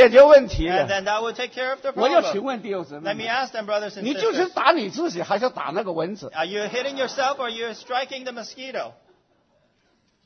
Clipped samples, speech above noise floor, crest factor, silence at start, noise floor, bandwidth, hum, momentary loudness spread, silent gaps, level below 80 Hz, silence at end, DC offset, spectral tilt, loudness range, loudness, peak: under 0.1%; 44 dB; 20 dB; 0 s; -65 dBFS; 6.6 kHz; none; 12 LU; none; -44 dBFS; 1.35 s; under 0.1%; -4.5 dB/octave; 6 LU; -22 LUFS; -2 dBFS